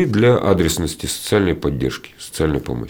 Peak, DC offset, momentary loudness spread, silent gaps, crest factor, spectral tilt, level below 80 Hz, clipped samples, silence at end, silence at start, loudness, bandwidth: -4 dBFS; under 0.1%; 10 LU; none; 16 dB; -5.5 dB/octave; -36 dBFS; under 0.1%; 0 s; 0 s; -18 LUFS; over 20 kHz